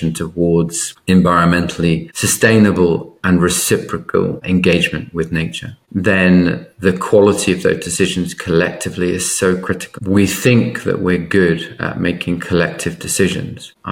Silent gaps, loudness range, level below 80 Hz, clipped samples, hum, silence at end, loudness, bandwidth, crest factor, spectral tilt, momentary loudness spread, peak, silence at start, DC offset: none; 3 LU; -42 dBFS; under 0.1%; none; 0 s; -15 LUFS; 17 kHz; 14 dB; -5 dB/octave; 9 LU; 0 dBFS; 0 s; under 0.1%